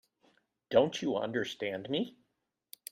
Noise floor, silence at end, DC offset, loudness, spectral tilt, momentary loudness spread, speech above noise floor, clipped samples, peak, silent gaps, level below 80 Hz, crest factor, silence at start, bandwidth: -82 dBFS; 0.8 s; under 0.1%; -33 LUFS; -5 dB/octave; 10 LU; 50 dB; under 0.1%; -12 dBFS; none; -74 dBFS; 22 dB; 0.7 s; 16 kHz